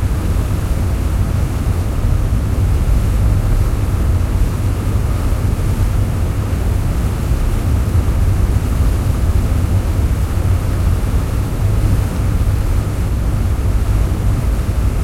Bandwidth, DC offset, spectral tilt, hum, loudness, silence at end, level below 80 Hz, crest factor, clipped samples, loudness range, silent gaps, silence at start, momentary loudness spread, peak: 16 kHz; under 0.1%; -7 dB/octave; none; -17 LUFS; 0 s; -18 dBFS; 12 dB; under 0.1%; 1 LU; none; 0 s; 2 LU; -2 dBFS